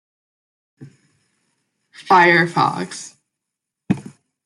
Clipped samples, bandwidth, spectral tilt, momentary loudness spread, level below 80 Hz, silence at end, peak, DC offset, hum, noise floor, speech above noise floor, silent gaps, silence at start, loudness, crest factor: under 0.1%; 11.5 kHz; -5 dB/octave; 19 LU; -64 dBFS; 0.45 s; -2 dBFS; under 0.1%; none; -82 dBFS; 66 dB; none; 0.8 s; -16 LUFS; 20 dB